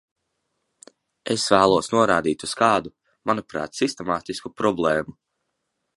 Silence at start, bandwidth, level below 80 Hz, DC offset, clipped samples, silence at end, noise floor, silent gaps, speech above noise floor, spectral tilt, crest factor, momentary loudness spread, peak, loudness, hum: 1.25 s; 11.5 kHz; -56 dBFS; under 0.1%; under 0.1%; 0.85 s; -77 dBFS; none; 55 dB; -4 dB/octave; 22 dB; 14 LU; -2 dBFS; -22 LUFS; none